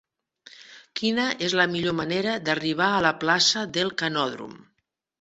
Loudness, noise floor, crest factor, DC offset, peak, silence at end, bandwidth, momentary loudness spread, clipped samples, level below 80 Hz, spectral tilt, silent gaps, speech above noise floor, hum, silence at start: -23 LUFS; -77 dBFS; 22 dB; under 0.1%; -4 dBFS; 0.65 s; 8.2 kHz; 9 LU; under 0.1%; -62 dBFS; -3 dB/octave; none; 52 dB; none; 0.6 s